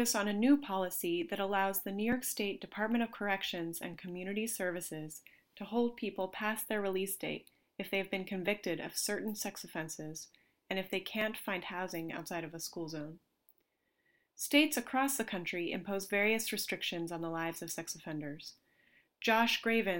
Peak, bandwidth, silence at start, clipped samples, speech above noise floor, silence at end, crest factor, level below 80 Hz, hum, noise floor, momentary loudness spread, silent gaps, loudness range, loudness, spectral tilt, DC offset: -14 dBFS; 17 kHz; 0 s; under 0.1%; 43 dB; 0 s; 22 dB; -72 dBFS; none; -79 dBFS; 13 LU; none; 6 LU; -35 LUFS; -3.5 dB/octave; under 0.1%